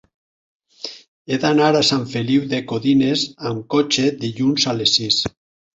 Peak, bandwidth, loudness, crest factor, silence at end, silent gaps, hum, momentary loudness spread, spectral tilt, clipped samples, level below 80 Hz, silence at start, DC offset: -2 dBFS; 8 kHz; -18 LUFS; 18 dB; 0.45 s; 1.08-1.25 s; none; 12 LU; -4.5 dB/octave; under 0.1%; -56 dBFS; 0.85 s; under 0.1%